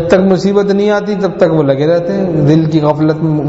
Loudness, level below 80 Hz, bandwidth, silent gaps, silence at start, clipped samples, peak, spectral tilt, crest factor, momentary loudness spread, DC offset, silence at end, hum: -11 LUFS; -42 dBFS; 8 kHz; none; 0 s; under 0.1%; 0 dBFS; -8 dB/octave; 10 dB; 3 LU; under 0.1%; 0 s; none